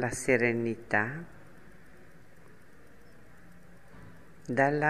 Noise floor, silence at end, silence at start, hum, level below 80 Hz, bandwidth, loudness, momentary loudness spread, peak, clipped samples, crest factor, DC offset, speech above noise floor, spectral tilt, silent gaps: -57 dBFS; 0 s; 0 s; none; -62 dBFS; 14.5 kHz; -29 LUFS; 27 LU; -10 dBFS; under 0.1%; 24 dB; 0.3%; 29 dB; -5.5 dB/octave; none